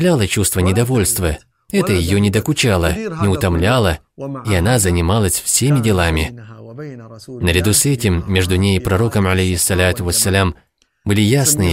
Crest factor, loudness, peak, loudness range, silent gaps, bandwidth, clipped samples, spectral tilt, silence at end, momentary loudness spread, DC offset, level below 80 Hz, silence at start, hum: 14 dB; -15 LUFS; 0 dBFS; 2 LU; none; 16.5 kHz; under 0.1%; -4.5 dB/octave; 0 s; 13 LU; under 0.1%; -32 dBFS; 0 s; none